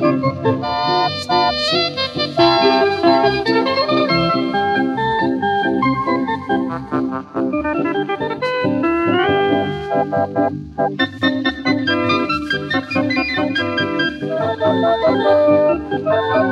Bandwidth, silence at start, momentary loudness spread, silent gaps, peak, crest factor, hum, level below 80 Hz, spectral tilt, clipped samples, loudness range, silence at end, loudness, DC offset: 10.5 kHz; 0 s; 6 LU; none; -2 dBFS; 16 dB; none; -48 dBFS; -6 dB/octave; under 0.1%; 4 LU; 0 s; -17 LUFS; under 0.1%